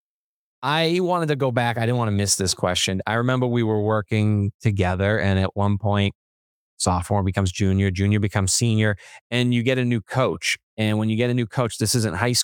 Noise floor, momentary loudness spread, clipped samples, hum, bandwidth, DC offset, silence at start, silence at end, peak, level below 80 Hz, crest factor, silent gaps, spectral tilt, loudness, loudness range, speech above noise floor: under -90 dBFS; 4 LU; under 0.1%; none; 18.5 kHz; under 0.1%; 0.6 s; 0 s; -4 dBFS; -54 dBFS; 18 dB; 4.54-4.59 s, 6.15-6.77 s, 9.21-9.30 s, 10.63-10.77 s; -5 dB/octave; -22 LUFS; 1 LU; over 69 dB